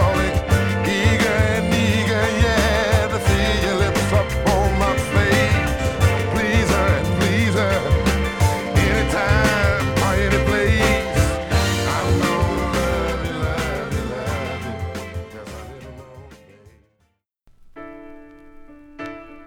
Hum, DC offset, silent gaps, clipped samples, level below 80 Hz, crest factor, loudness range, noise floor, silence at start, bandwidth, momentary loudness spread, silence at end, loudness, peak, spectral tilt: none; under 0.1%; none; under 0.1%; -28 dBFS; 16 dB; 11 LU; -67 dBFS; 0 s; 18 kHz; 13 LU; 0 s; -19 LUFS; -4 dBFS; -5.5 dB/octave